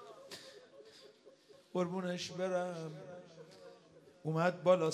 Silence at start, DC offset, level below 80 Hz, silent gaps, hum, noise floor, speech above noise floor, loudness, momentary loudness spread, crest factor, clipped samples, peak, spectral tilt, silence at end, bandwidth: 0 s; under 0.1%; -86 dBFS; none; none; -62 dBFS; 27 dB; -37 LUFS; 25 LU; 24 dB; under 0.1%; -16 dBFS; -6 dB/octave; 0 s; 12.5 kHz